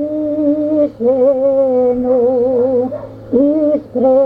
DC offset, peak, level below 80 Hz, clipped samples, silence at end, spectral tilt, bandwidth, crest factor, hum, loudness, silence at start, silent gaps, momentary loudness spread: under 0.1%; -2 dBFS; -48 dBFS; under 0.1%; 0 s; -10.5 dB/octave; 3.8 kHz; 12 dB; none; -14 LUFS; 0 s; none; 5 LU